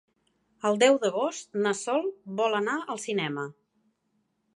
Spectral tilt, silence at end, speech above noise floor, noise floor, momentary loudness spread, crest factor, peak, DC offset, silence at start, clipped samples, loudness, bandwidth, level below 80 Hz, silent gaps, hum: -4 dB/octave; 1.05 s; 48 dB; -75 dBFS; 11 LU; 22 dB; -8 dBFS; under 0.1%; 0.65 s; under 0.1%; -27 LUFS; 11.5 kHz; -82 dBFS; none; none